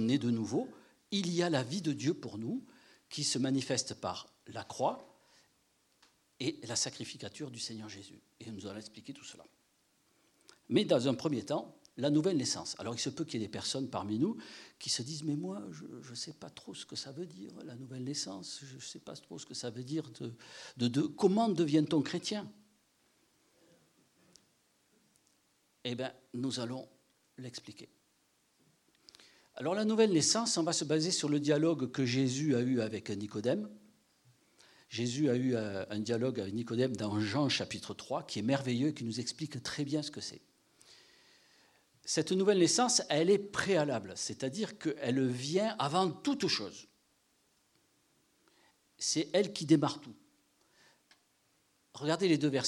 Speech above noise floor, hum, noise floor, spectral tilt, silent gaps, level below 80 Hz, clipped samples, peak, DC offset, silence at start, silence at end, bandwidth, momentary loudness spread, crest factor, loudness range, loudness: 40 dB; none; -74 dBFS; -4.5 dB/octave; none; -80 dBFS; under 0.1%; -14 dBFS; under 0.1%; 0 s; 0 s; 12.5 kHz; 17 LU; 22 dB; 12 LU; -34 LUFS